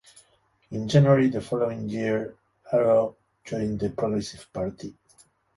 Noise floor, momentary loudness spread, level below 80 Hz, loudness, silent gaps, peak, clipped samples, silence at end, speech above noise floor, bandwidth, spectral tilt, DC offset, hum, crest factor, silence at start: -64 dBFS; 16 LU; -56 dBFS; -25 LUFS; none; -6 dBFS; under 0.1%; 0.65 s; 40 dB; 11.5 kHz; -7.5 dB/octave; under 0.1%; none; 20 dB; 0.7 s